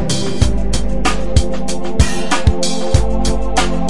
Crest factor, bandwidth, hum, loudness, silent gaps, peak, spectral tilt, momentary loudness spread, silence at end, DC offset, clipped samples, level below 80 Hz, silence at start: 18 dB; 11.5 kHz; none; -17 LUFS; none; 0 dBFS; -5 dB/octave; 4 LU; 0 s; 20%; under 0.1%; -20 dBFS; 0 s